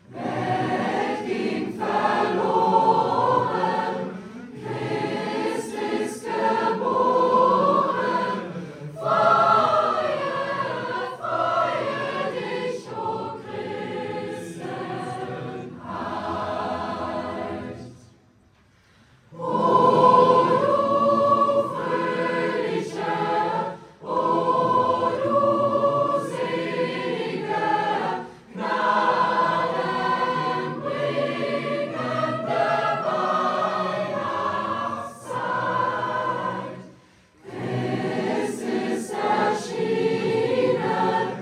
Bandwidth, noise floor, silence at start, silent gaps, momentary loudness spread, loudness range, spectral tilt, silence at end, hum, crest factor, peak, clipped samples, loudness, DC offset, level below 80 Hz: 13 kHz; -58 dBFS; 0.1 s; none; 13 LU; 10 LU; -6 dB/octave; 0 s; none; 20 dB; -4 dBFS; under 0.1%; -23 LUFS; under 0.1%; -66 dBFS